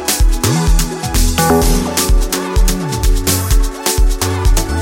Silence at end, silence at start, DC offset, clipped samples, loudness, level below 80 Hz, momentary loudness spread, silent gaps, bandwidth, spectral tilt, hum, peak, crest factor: 0 s; 0 s; under 0.1%; under 0.1%; -15 LUFS; -14 dBFS; 4 LU; none; 17 kHz; -4 dB/octave; none; 0 dBFS; 12 dB